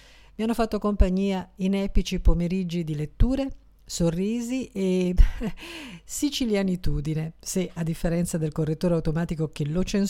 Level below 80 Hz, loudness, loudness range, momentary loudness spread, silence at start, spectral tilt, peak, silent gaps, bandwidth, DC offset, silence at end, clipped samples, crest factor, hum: -28 dBFS; -27 LUFS; 1 LU; 7 LU; 0.4 s; -6 dB/octave; -4 dBFS; none; 16 kHz; under 0.1%; 0 s; under 0.1%; 20 dB; none